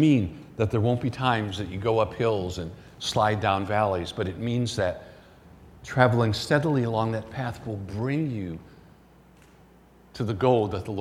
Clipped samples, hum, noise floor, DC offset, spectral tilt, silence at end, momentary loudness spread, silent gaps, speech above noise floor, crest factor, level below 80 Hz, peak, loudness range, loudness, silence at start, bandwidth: under 0.1%; none; -54 dBFS; under 0.1%; -6.5 dB/octave; 0 s; 11 LU; none; 29 dB; 22 dB; -52 dBFS; -4 dBFS; 5 LU; -26 LUFS; 0 s; 13 kHz